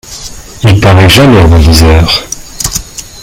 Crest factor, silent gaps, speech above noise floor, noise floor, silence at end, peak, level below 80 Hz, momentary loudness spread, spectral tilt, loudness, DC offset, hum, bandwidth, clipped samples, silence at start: 6 dB; none; 21 dB; -24 dBFS; 0 s; 0 dBFS; -16 dBFS; 20 LU; -5 dB/octave; -5 LUFS; under 0.1%; none; 17 kHz; 4%; 0.05 s